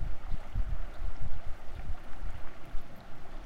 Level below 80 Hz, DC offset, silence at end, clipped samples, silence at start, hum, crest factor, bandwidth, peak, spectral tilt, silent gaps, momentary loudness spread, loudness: -36 dBFS; under 0.1%; 0 s; under 0.1%; 0 s; none; 12 dB; 4.5 kHz; -16 dBFS; -6.5 dB/octave; none; 9 LU; -44 LUFS